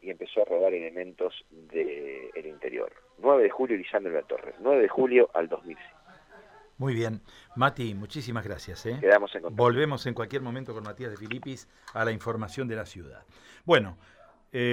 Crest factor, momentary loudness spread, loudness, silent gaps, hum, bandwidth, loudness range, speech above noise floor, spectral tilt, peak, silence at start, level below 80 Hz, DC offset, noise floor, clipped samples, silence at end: 20 dB; 17 LU; -28 LUFS; none; none; 13 kHz; 7 LU; 25 dB; -6.5 dB/octave; -8 dBFS; 0.05 s; -62 dBFS; under 0.1%; -53 dBFS; under 0.1%; 0 s